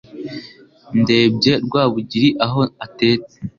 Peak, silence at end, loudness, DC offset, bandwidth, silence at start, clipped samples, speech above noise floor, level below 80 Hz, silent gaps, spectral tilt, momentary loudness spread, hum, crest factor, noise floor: -2 dBFS; 0.1 s; -17 LUFS; under 0.1%; 7.2 kHz; 0.15 s; under 0.1%; 26 dB; -52 dBFS; none; -6.5 dB/octave; 17 LU; none; 16 dB; -43 dBFS